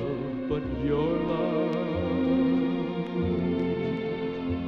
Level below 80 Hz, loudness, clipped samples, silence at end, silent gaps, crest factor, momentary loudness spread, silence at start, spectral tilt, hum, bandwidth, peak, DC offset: -46 dBFS; -28 LUFS; under 0.1%; 0 s; none; 12 dB; 6 LU; 0 s; -9.5 dB/octave; none; 5.8 kHz; -14 dBFS; under 0.1%